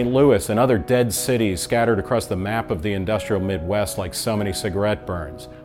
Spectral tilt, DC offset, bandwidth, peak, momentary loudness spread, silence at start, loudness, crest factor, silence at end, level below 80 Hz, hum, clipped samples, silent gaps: -5.5 dB/octave; under 0.1%; 17.5 kHz; -4 dBFS; 7 LU; 0 s; -21 LUFS; 16 dB; 0 s; -42 dBFS; none; under 0.1%; none